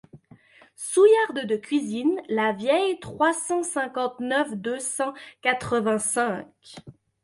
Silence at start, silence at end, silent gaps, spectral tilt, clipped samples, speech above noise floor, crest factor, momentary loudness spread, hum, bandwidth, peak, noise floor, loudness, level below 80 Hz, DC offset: 0.15 s; 0.3 s; none; -3.5 dB/octave; under 0.1%; 29 dB; 18 dB; 10 LU; none; 11.5 kHz; -6 dBFS; -53 dBFS; -24 LUFS; -64 dBFS; under 0.1%